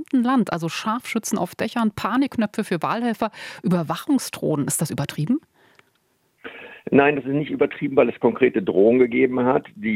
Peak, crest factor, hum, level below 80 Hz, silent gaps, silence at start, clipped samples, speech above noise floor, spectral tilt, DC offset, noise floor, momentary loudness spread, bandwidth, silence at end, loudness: -2 dBFS; 20 dB; none; -62 dBFS; none; 0 s; under 0.1%; 45 dB; -5.5 dB/octave; under 0.1%; -66 dBFS; 9 LU; 16 kHz; 0 s; -21 LUFS